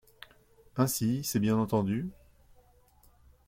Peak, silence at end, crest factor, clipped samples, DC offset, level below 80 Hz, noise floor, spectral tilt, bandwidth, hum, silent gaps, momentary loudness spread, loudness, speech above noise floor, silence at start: -12 dBFS; 1.35 s; 20 dB; under 0.1%; under 0.1%; -60 dBFS; -62 dBFS; -5.5 dB/octave; 16.5 kHz; none; none; 10 LU; -30 LUFS; 33 dB; 0.75 s